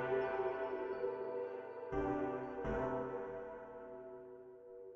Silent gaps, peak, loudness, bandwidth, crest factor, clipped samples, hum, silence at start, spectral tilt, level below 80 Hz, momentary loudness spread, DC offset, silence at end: none; -26 dBFS; -42 LUFS; 6.6 kHz; 14 dB; under 0.1%; none; 0 s; -6 dB/octave; -60 dBFS; 15 LU; under 0.1%; 0 s